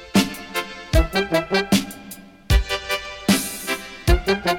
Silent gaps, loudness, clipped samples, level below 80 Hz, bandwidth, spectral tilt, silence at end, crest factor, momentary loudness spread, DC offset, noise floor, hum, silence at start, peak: none; -22 LUFS; under 0.1%; -26 dBFS; 17.5 kHz; -4.5 dB/octave; 0 s; 16 dB; 8 LU; under 0.1%; -41 dBFS; none; 0 s; -6 dBFS